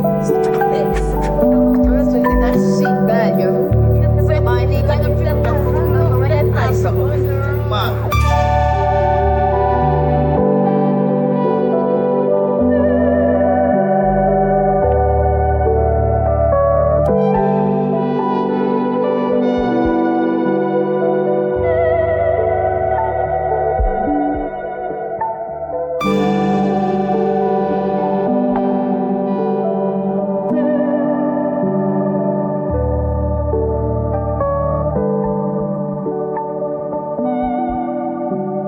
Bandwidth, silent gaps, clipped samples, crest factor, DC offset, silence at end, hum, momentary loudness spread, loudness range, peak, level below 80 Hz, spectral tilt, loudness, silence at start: 19 kHz; none; under 0.1%; 12 dB; under 0.1%; 0 s; none; 6 LU; 4 LU; -2 dBFS; -26 dBFS; -8.5 dB/octave; -16 LUFS; 0 s